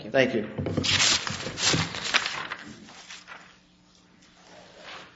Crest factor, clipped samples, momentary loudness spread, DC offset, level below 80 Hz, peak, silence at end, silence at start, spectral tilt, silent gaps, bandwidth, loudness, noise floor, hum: 26 dB; under 0.1%; 24 LU; under 0.1%; -58 dBFS; -4 dBFS; 0.05 s; 0 s; -2.5 dB/octave; none; 8.2 kHz; -25 LUFS; -58 dBFS; none